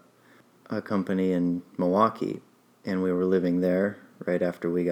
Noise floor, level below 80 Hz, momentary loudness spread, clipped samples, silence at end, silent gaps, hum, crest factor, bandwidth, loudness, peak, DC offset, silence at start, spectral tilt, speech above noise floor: -58 dBFS; -70 dBFS; 11 LU; under 0.1%; 0 s; none; none; 18 dB; 12.5 kHz; -27 LUFS; -8 dBFS; under 0.1%; 0.7 s; -8.5 dB/octave; 32 dB